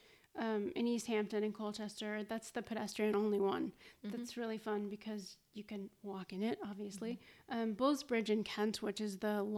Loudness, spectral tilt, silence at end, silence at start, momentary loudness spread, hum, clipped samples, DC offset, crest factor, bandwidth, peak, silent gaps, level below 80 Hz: -40 LUFS; -5 dB/octave; 0 s; 0.35 s; 12 LU; none; under 0.1%; under 0.1%; 18 dB; 15 kHz; -22 dBFS; none; -78 dBFS